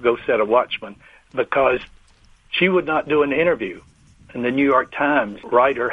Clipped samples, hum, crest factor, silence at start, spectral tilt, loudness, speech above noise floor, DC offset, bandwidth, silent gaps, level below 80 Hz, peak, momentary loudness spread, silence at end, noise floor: under 0.1%; none; 18 dB; 0 s; -7 dB/octave; -19 LUFS; 33 dB; under 0.1%; 7.2 kHz; none; -52 dBFS; -2 dBFS; 12 LU; 0 s; -52 dBFS